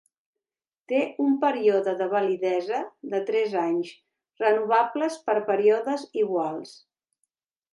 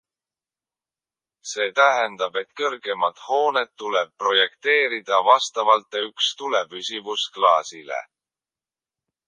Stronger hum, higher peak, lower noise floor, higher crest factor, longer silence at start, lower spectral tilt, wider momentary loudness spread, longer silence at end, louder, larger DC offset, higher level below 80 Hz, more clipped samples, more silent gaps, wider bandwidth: neither; second, -8 dBFS vs -2 dBFS; about the same, under -90 dBFS vs under -90 dBFS; about the same, 18 dB vs 22 dB; second, 0.9 s vs 1.45 s; first, -5.5 dB/octave vs -0.5 dB/octave; about the same, 9 LU vs 11 LU; second, 1 s vs 1.25 s; second, -25 LUFS vs -21 LUFS; neither; about the same, -82 dBFS vs -84 dBFS; neither; neither; first, 11.5 kHz vs 10 kHz